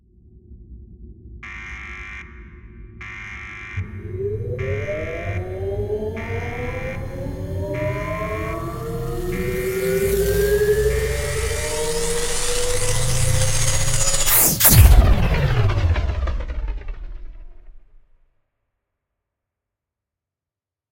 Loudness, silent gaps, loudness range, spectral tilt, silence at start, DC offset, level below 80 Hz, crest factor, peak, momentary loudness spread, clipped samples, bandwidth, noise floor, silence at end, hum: -20 LUFS; none; 18 LU; -4 dB/octave; 0.5 s; under 0.1%; -26 dBFS; 20 dB; 0 dBFS; 18 LU; under 0.1%; 16.5 kHz; -89 dBFS; 3.15 s; none